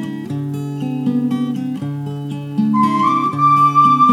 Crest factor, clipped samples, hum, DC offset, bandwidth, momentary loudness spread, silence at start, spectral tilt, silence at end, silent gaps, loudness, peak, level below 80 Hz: 14 dB; under 0.1%; none; under 0.1%; 14 kHz; 13 LU; 0 s; -7.5 dB/octave; 0 s; none; -16 LUFS; -2 dBFS; -68 dBFS